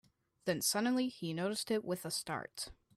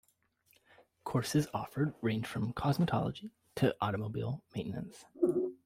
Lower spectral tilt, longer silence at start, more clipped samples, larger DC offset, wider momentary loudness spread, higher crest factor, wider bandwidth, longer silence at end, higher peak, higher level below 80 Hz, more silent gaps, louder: second, -3.5 dB/octave vs -6.5 dB/octave; second, 0.45 s vs 1.05 s; neither; neither; about the same, 10 LU vs 11 LU; about the same, 16 dB vs 18 dB; about the same, 15.5 kHz vs 16 kHz; first, 0.25 s vs 0.1 s; about the same, -20 dBFS vs -18 dBFS; second, -70 dBFS vs -62 dBFS; neither; about the same, -37 LUFS vs -35 LUFS